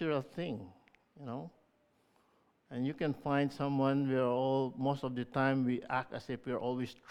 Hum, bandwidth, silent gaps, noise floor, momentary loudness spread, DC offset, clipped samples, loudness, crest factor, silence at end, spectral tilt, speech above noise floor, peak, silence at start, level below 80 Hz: none; 9.8 kHz; none; -73 dBFS; 14 LU; under 0.1%; under 0.1%; -35 LUFS; 20 dB; 0.15 s; -8 dB/octave; 38 dB; -16 dBFS; 0 s; -70 dBFS